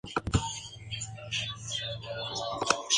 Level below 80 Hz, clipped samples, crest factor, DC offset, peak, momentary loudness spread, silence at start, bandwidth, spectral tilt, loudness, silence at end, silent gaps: -46 dBFS; under 0.1%; 26 dB; under 0.1%; -6 dBFS; 8 LU; 0.05 s; 11 kHz; -2.5 dB/octave; -33 LUFS; 0 s; none